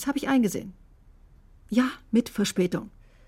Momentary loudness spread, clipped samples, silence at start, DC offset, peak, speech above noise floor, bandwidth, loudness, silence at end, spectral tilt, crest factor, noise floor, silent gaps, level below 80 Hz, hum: 12 LU; under 0.1%; 0 s; under 0.1%; -10 dBFS; 28 dB; 16 kHz; -26 LUFS; 0.4 s; -5 dB/octave; 18 dB; -54 dBFS; none; -54 dBFS; none